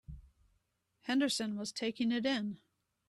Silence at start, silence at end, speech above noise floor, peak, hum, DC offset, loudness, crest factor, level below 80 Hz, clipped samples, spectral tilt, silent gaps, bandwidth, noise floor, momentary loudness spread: 0.1 s; 0.5 s; 44 dB; -22 dBFS; none; under 0.1%; -35 LUFS; 16 dB; -62 dBFS; under 0.1%; -3.5 dB/octave; none; 13 kHz; -79 dBFS; 20 LU